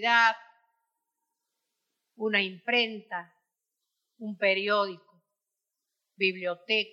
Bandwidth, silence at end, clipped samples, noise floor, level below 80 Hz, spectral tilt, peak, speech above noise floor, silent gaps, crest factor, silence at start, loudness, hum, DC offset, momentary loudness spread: 9 kHz; 0.05 s; under 0.1%; -87 dBFS; under -90 dBFS; -4 dB/octave; -10 dBFS; 59 dB; none; 20 dB; 0 s; -27 LUFS; none; under 0.1%; 16 LU